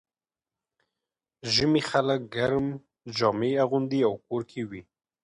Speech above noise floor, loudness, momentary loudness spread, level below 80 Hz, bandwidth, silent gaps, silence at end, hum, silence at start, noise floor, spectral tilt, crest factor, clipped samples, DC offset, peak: over 64 dB; -26 LUFS; 14 LU; -60 dBFS; 11 kHz; none; 0.4 s; none; 1.45 s; under -90 dBFS; -5.5 dB/octave; 20 dB; under 0.1%; under 0.1%; -8 dBFS